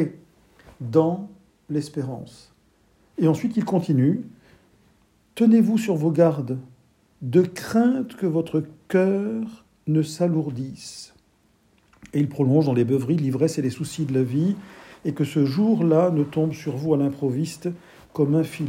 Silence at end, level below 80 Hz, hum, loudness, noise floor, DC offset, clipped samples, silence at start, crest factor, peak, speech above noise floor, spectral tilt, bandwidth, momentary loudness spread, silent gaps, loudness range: 0 s; -64 dBFS; none; -23 LUFS; -62 dBFS; under 0.1%; under 0.1%; 0 s; 18 dB; -4 dBFS; 40 dB; -8 dB/octave; 16 kHz; 16 LU; none; 4 LU